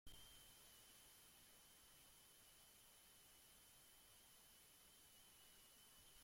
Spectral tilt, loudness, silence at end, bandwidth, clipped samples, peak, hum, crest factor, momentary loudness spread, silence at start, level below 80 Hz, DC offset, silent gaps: -1 dB/octave; -66 LUFS; 0 s; 16.5 kHz; under 0.1%; -46 dBFS; none; 22 dB; 3 LU; 0.05 s; -80 dBFS; under 0.1%; none